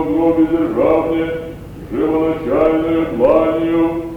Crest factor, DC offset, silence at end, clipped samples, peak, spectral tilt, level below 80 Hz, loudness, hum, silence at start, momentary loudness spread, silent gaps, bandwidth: 14 dB; under 0.1%; 0 s; under 0.1%; -2 dBFS; -8.5 dB/octave; -38 dBFS; -15 LUFS; none; 0 s; 10 LU; none; 4.5 kHz